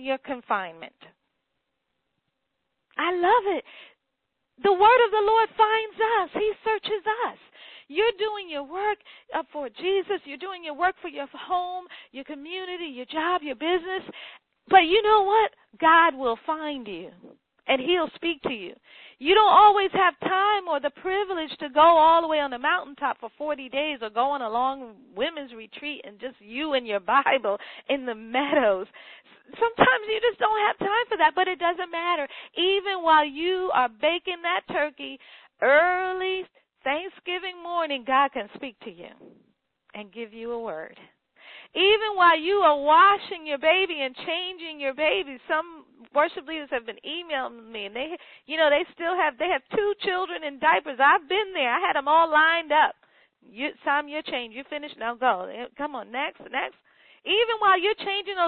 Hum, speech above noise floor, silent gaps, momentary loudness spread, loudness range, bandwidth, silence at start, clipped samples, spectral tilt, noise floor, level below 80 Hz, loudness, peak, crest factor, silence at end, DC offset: none; 56 dB; none; 16 LU; 8 LU; 4.5 kHz; 0 s; under 0.1%; -7.5 dB/octave; -80 dBFS; -62 dBFS; -24 LUFS; -4 dBFS; 22 dB; 0 s; under 0.1%